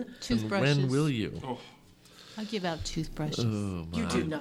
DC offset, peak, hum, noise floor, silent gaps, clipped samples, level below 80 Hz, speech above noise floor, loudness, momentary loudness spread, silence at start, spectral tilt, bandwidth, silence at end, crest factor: under 0.1%; -14 dBFS; none; -55 dBFS; none; under 0.1%; -50 dBFS; 25 dB; -31 LUFS; 13 LU; 0 s; -6 dB/octave; 14.5 kHz; 0 s; 18 dB